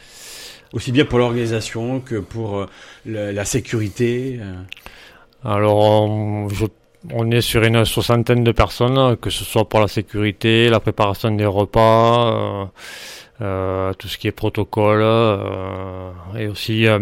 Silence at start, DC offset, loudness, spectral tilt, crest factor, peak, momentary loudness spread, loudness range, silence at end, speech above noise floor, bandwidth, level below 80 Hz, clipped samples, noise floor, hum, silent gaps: 0.15 s; under 0.1%; -18 LUFS; -6 dB/octave; 16 dB; -2 dBFS; 17 LU; 6 LU; 0 s; 27 dB; 16.5 kHz; -40 dBFS; under 0.1%; -45 dBFS; none; none